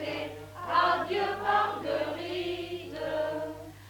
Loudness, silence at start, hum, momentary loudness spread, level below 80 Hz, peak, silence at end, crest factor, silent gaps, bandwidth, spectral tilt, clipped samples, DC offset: -30 LUFS; 0 s; 50 Hz at -55 dBFS; 11 LU; -60 dBFS; -12 dBFS; 0 s; 18 dB; none; 19 kHz; -5 dB/octave; under 0.1%; under 0.1%